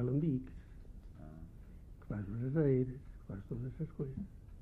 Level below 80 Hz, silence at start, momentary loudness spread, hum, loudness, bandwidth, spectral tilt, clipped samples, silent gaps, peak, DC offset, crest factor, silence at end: -54 dBFS; 0 s; 23 LU; none; -38 LUFS; 3.7 kHz; -11.5 dB/octave; under 0.1%; none; -20 dBFS; under 0.1%; 18 dB; 0 s